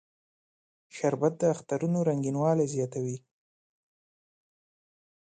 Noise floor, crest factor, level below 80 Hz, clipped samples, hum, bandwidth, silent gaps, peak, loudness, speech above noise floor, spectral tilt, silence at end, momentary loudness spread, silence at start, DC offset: under -90 dBFS; 20 dB; -74 dBFS; under 0.1%; none; 9.4 kHz; none; -12 dBFS; -29 LUFS; over 62 dB; -7.5 dB/octave; 2.05 s; 9 LU; 0.95 s; under 0.1%